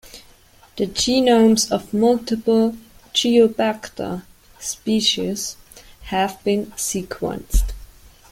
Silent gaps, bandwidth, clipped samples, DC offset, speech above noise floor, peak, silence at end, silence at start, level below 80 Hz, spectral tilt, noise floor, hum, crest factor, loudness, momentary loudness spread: none; 16.5 kHz; under 0.1%; under 0.1%; 31 dB; -2 dBFS; 0.45 s; 0.05 s; -32 dBFS; -4 dB/octave; -50 dBFS; none; 18 dB; -20 LUFS; 16 LU